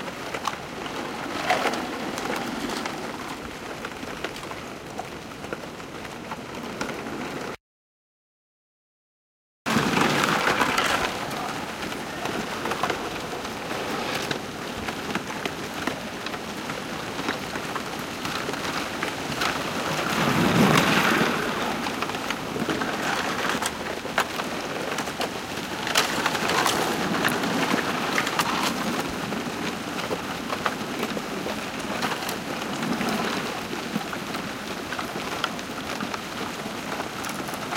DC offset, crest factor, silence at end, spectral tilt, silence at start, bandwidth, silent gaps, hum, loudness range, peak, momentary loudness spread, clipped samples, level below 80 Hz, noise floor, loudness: under 0.1%; 22 dB; 0 s; -3.5 dB/octave; 0 s; 17 kHz; 7.60-9.65 s; none; 11 LU; -4 dBFS; 11 LU; under 0.1%; -54 dBFS; under -90 dBFS; -27 LUFS